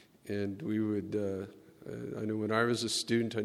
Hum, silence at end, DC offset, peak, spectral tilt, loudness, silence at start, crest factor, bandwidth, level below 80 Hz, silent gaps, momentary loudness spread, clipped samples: none; 0 s; under 0.1%; -14 dBFS; -4.5 dB/octave; -34 LUFS; 0.25 s; 20 dB; 14.5 kHz; -72 dBFS; none; 13 LU; under 0.1%